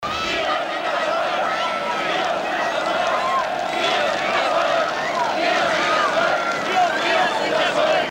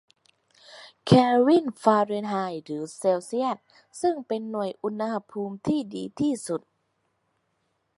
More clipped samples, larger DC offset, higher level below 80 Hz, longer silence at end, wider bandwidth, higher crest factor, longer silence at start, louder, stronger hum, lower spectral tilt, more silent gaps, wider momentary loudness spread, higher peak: neither; neither; first, -56 dBFS vs -64 dBFS; second, 0 s vs 1.4 s; first, 16 kHz vs 11.5 kHz; second, 14 dB vs 22 dB; second, 0 s vs 0.7 s; first, -20 LUFS vs -25 LUFS; neither; second, -2.5 dB/octave vs -6.5 dB/octave; neither; second, 4 LU vs 15 LU; second, -8 dBFS vs -4 dBFS